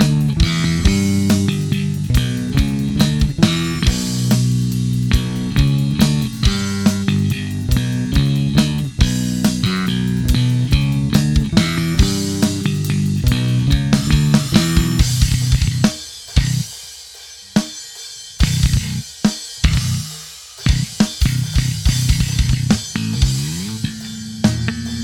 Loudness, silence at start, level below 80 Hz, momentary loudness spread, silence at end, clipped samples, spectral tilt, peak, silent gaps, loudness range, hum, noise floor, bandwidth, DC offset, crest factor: -17 LUFS; 0 s; -24 dBFS; 7 LU; 0 s; under 0.1%; -5 dB/octave; 0 dBFS; none; 4 LU; none; -37 dBFS; 18.5 kHz; under 0.1%; 16 dB